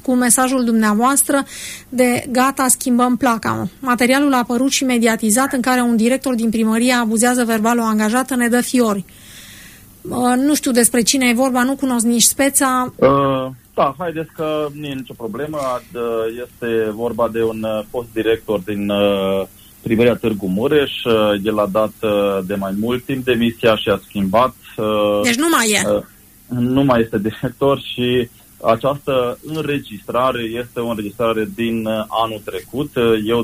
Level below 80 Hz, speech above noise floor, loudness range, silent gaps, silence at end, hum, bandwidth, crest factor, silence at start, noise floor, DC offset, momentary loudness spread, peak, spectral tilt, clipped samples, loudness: -48 dBFS; 24 dB; 6 LU; none; 0 s; none; 15.5 kHz; 16 dB; 0.05 s; -41 dBFS; under 0.1%; 11 LU; -2 dBFS; -4 dB/octave; under 0.1%; -17 LUFS